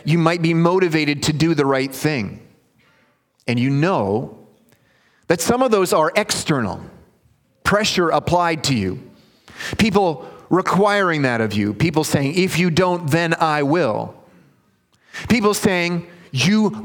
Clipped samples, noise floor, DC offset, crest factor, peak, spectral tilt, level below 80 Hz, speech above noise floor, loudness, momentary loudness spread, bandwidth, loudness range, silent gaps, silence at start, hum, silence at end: under 0.1%; -60 dBFS; under 0.1%; 20 dB; 0 dBFS; -5 dB/octave; -50 dBFS; 43 dB; -18 LUFS; 11 LU; 19 kHz; 3 LU; none; 0.05 s; none; 0 s